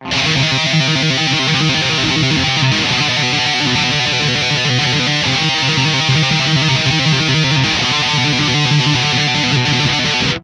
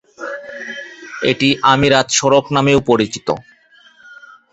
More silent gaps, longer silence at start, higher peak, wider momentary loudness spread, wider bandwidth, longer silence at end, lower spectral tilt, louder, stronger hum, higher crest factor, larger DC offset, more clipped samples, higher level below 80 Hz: neither; second, 0 s vs 0.2 s; about the same, 0 dBFS vs 0 dBFS; second, 1 LU vs 16 LU; first, 10.5 kHz vs 8.2 kHz; second, 0.05 s vs 0.4 s; about the same, -3.5 dB/octave vs -4 dB/octave; about the same, -13 LUFS vs -14 LUFS; neither; about the same, 14 dB vs 16 dB; neither; neither; about the same, -42 dBFS vs -46 dBFS